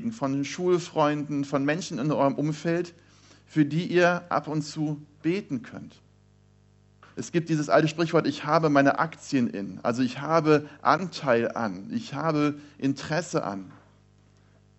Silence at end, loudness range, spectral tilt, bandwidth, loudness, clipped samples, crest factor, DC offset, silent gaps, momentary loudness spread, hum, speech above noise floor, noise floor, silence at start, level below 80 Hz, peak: 1 s; 5 LU; -6 dB/octave; 8.2 kHz; -26 LUFS; under 0.1%; 22 dB; under 0.1%; none; 9 LU; 50 Hz at -55 dBFS; 33 dB; -59 dBFS; 0 s; -68 dBFS; -6 dBFS